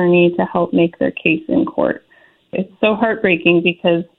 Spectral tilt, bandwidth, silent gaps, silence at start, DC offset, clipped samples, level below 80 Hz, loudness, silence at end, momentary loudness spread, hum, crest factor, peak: -10 dB/octave; 4.1 kHz; none; 0 s; under 0.1%; under 0.1%; -54 dBFS; -16 LUFS; 0.15 s; 10 LU; none; 16 dB; 0 dBFS